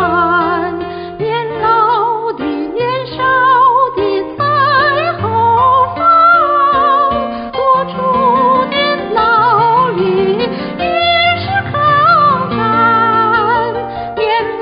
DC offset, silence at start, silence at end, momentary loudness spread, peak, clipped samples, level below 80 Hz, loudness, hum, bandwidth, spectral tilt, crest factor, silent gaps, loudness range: under 0.1%; 0 s; 0 s; 9 LU; 0 dBFS; under 0.1%; -42 dBFS; -12 LUFS; none; 5.2 kHz; -2.5 dB/octave; 12 dB; none; 2 LU